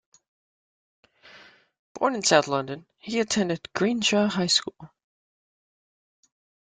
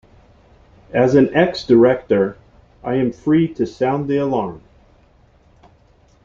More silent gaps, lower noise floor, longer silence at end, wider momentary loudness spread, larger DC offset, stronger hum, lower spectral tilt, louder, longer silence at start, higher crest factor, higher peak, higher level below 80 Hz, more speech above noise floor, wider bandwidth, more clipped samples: first, 1.79-1.95 s vs none; about the same, -53 dBFS vs -53 dBFS; about the same, 1.75 s vs 1.65 s; about the same, 11 LU vs 10 LU; neither; neither; second, -3 dB/octave vs -7.5 dB/octave; second, -24 LUFS vs -17 LUFS; first, 1.35 s vs 0.9 s; about the same, 22 dB vs 18 dB; second, -6 dBFS vs -2 dBFS; second, -68 dBFS vs -50 dBFS; second, 28 dB vs 37 dB; first, 9.6 kHz vs 7.4 kHz; neither